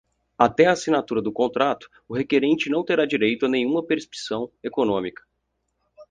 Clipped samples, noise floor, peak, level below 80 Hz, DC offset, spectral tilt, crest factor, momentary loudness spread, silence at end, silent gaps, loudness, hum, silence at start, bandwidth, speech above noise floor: under 0.1%; -75 dBFS; -2 dBFS; -62 dBFS; under 0.1%; -5 dB/octave; 22 dB; 11 LU; 0.05 s; none; -22 LUFS; none; 0.4 s; 9.6 kHz; 53 dB